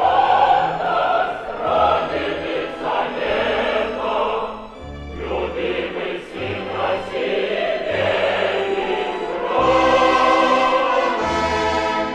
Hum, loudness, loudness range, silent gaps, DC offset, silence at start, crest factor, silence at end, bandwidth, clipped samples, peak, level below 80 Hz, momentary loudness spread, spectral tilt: none; -19 LUFS; 7 LU; none; under 0.1%; 0 s; 14 dB; 0 s; 10.5 kHz; under 0.1%; -4 dBFS; -44 dBFS; 11 LU; -4.5 dB/octave